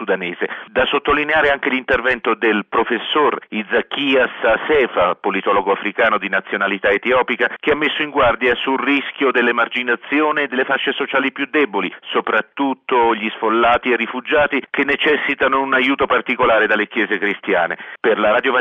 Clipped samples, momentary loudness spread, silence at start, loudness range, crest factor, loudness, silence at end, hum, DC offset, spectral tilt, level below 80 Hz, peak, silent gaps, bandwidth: under 0.1%; 5 LU; 0 s; 2 LU; 14 dB; -17 LUFS; 0 s; none; under 0.1%; -6 dB/octave; -48 dBFS; -4 dBFS; none; 7 kHz